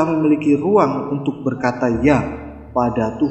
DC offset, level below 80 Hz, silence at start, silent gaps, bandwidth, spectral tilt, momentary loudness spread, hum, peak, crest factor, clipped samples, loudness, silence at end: under 0.1%; -42 dBFS; 0 s; none; 8.4 kHz; -8 dB/octave; 8 LU; none; 0 dBFS; 18 dB; under 0.1%; -18 LUFS; 0 s